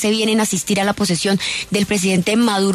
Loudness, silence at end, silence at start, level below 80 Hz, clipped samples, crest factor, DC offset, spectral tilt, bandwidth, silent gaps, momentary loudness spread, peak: -17 LUFS; 0 s; 0 s; -50 dBFS; under 0.1%; 12 dB; under 0.1%; -4 dB/octave; 13.5 kHz; none; 3 LU; -6 dBFS